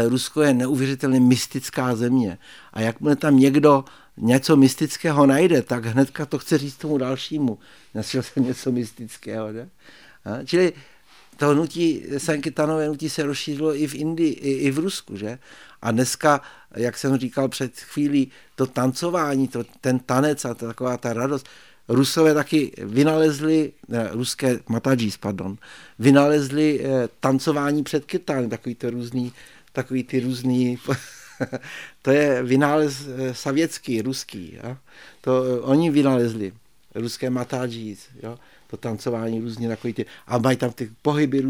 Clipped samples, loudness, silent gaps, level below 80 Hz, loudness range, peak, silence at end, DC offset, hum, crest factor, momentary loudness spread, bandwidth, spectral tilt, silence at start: under 0.1%; -22 LUFS; none; -62 dBFS; 7 LU; -2 dBFS; 0 s; 0.2%; none; 18 dB; 15 LU; 18 kHz; -6 dB/octave; 0 s